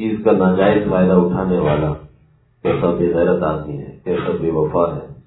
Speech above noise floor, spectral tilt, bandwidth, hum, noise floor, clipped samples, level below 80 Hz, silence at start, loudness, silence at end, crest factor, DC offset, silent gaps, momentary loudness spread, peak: 37 dB; -12 dB/octave; 4.1 kHz; none; -53 dBFS; under 0.1%; -40 dBFS; 0 s; -17 LUFS; 0.05 s; 16 dB; under 0.1%; none; 10 LU; -2 dBFS